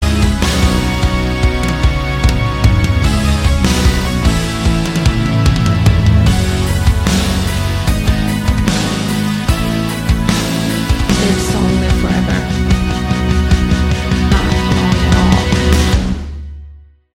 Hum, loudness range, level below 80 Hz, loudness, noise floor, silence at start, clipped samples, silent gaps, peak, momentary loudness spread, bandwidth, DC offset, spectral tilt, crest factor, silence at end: none; 2 LU; -18 dBFS; -14 LUFS; -37 dBFS; 0 s; under 0.1%; none; 0 dBFS; 4 LU; 16.5 kHz; under 0.1%; -5.5 dB/octave; 12 dB; 0.4 s